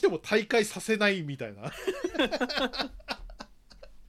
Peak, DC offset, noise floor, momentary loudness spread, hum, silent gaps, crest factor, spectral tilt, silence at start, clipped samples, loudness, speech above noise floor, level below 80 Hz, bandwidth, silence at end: -12 dBFS; under 0.1%; -51 dBFS; 14 LU; none; none; 20 dB; -4 dB/octave; 0 s; under 0.1%; -29 LUFS; 22 dB; -54 dBFS; 15.5 kHz; 0 s